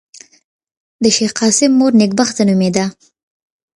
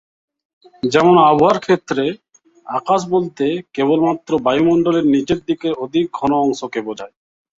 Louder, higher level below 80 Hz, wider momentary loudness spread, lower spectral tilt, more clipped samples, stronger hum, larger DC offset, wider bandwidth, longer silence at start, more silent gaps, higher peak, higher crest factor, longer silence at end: first, -13 LUFS vs -16 LUFS; about the same, -56 dBFS vs -54 dBFS; second, 6 LU vs 13 LU; second, -4 dB/octave vs -6 dB/octave; neither; neither; neither; first, 11.5 kHz vs 7.8 kHz; first, 1 s vs 0.85 s; neither; about the same, 0 dBFS vs 0 dBFS; about the same, 16 dB vs 16 dB; first, 0.85 s vs 0.5 s